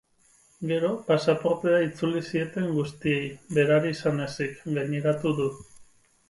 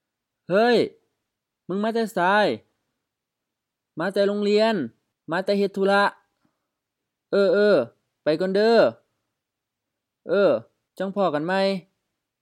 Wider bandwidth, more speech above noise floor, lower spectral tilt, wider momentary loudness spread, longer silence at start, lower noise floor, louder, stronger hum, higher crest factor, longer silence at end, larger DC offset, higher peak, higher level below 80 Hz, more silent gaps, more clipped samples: second, 11.5 kHz vs 14.5 kHz; second, 36 dB vs 63 dB; about the same, -6.5 dB/octave vs -6 dB/octave; second, 7 LU vs 11 LU; about the same, 0.6 s vs 0.5 s; second, -62 dBFS vs -84 dBFS; second, -26 LUFS vs -22 LUFS; neither; about the same, 18 dB vs 18 dB; second, 0.45 s vs 0.6 s; neither; about the same, -8 dBFS vs -6 dBFS; first, -62 dBFS vs -80 dBFS; neither; neither